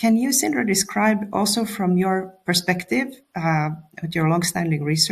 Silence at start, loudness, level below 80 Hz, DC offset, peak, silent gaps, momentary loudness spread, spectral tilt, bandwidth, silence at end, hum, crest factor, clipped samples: 0 s; -21 LUFS; -60 dBFS; under 0.1%; -4 dBFS; none; 7 LU; -4 dB/octave; 15 kHz; 0 s; none; 18 dB; under 0.1%